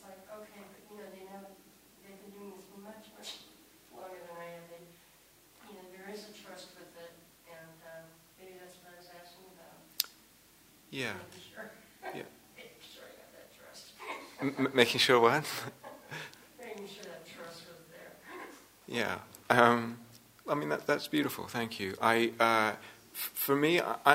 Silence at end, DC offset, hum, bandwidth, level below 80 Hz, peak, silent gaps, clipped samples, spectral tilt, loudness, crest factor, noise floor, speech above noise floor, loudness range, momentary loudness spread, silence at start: 0 s; under 0.1%; none; 16 kHz; -76 dBFS; -4 dBFS; none; under 0.1%; -4 dB/octave; -31 LUFS; 30 dB; -62 dBFS; 32 dB; 20 LU; 26 LU; 0.05 s